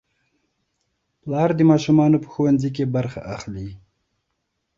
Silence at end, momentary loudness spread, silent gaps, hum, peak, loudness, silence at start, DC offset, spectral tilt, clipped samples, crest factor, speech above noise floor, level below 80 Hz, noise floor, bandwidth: 1 s; 17 LU; none; none; -4 dBFS; -19 LUFS; 1.25 s; under 0.1%; -8 dB/octave; under 0.1%; 18 dB; 56 dB; -52 dBFS; -75 dBFS; 7.6 kHz